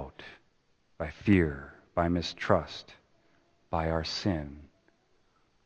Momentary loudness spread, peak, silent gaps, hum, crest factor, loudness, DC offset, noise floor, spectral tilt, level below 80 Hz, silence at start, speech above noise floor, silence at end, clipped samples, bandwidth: 19 LU; -6 dBFS; none; none; 26 dB; -30 LUFS; under 0.1%; -69 dBFS; -6.5 dB/octave; -48 dBFS; 0 s; 40 dB; 1 s; under 0.1%; 8.6 kHz